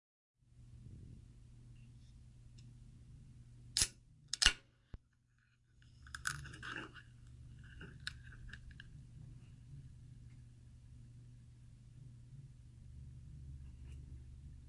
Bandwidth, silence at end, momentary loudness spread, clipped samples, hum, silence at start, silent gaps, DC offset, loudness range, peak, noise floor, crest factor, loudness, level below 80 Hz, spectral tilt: 11.5 kHz; 0 s; 24 LU; under 0.1%; none; 0.45 s; none; under 0.1%; 20 LU; -10 dBFS; -74 dBFS; 38 dB; -40 LUFS; -56 dBFS; -1 dB/octave